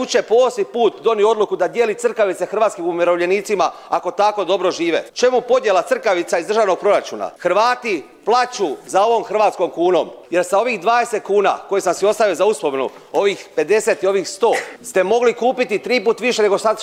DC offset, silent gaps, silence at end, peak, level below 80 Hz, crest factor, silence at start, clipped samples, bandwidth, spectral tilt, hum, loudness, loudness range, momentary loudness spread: under 0.1%; none; 0 s; -2 dBFS; -66 dBFS; 14 dB; 0 s; under 0.1%; 15 kHz; -3.5 dB/octave; none; -17 LUFS; 1 LU; 5 LU